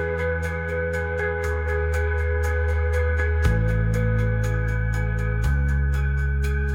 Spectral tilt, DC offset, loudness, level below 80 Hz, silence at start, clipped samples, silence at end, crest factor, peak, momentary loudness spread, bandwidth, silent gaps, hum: -7.5 dB/octave; under 0.1%; -24 LUFS; -26 dBFS; 0 s; under 0.1%; 0 s; 14 dB; -8 dBFS; 3 LU; 12 kHz; none; none